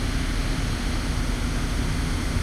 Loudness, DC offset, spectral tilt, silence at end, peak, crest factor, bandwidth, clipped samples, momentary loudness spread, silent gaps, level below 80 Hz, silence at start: -27 LUFS; under 0.1%; -5 dB/octave; 0 s; -12 dBFS; 12 dB; 14 kHz; under 0.1%; 1 LU; none; -26 dBFS; 0 s